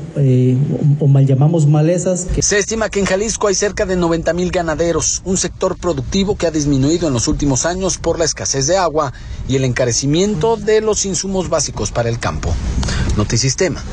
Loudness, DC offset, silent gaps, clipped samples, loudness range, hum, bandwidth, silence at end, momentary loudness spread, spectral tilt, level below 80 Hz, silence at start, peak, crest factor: -16 LUFS; under 0.1%; none; under 0.1%; 3 LU; none; 9.8 kHz; 0 s; 6 LU; -5 dB/octave; -28 dBFS; 0 s; -2 dBFS; 12 dB